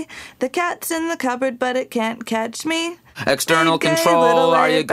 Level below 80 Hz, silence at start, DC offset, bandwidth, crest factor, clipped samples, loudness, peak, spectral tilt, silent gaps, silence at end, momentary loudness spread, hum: -60 dBFS; 0 s; under 0.1%; 16 kHz; 16 dB; under 0.1%; -19 LUFS; -2 dBFS; -3.5 dB/octave; none; 0 s; 10 LU; none